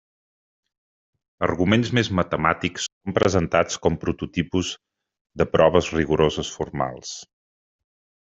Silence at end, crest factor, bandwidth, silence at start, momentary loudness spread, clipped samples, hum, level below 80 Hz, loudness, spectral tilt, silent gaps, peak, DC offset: 1 s; 22 dB; 8.2 kHz; 1.4 s; 11 LU; under 0.1%; none; -48 dBFS; -22 LUFS; -5 dB/octave; 2.92-3.01 s, 5.21-5.25 s; -2 dBFS; under 0.1%